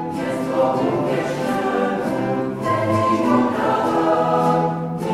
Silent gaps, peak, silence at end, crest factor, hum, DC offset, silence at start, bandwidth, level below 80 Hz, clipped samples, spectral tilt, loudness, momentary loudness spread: none; -4 dBFS; 0 s; 14 dB; none; under 0.1%; 0 s; 15 kHz; -54 dBFS; under 0.1%; -7 dB/octave; -20 LUFS; 5 LU